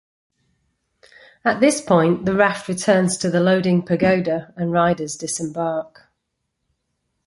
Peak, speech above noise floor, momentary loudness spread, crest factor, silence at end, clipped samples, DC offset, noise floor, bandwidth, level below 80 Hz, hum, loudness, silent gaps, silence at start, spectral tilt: -2 dBFS; 57 dB; 8 LU; 18 dB; 1.45 s; under 0.1%; under 0.1%; -76 dBFS; 11.5 kHz; -56 dBFS; none; -19 LUFS; none; 1.45 s; -5.5 dB/octave